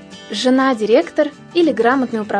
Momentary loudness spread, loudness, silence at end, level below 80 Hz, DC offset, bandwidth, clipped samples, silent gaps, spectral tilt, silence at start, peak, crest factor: 5 LU; -16 LUFS; 0 s; -64 dBFS; under 0.1%; 10.5 kHz; under 0.1%; none; -4.5 dB/octave; 0 s; 0 dBFS; 16 dB